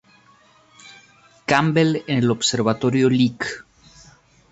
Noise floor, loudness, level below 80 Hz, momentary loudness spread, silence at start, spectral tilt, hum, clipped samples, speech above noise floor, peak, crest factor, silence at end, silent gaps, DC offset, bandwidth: -54 dBFS; -19 LUFS; -58 dBFS; 11 LU; 0.85 s; -5 dB/octave; none; under 0.1%; 35 dB; -2 dBFS; 20 dB; 0.9 s; none; under 0.1%; 8.2 kHz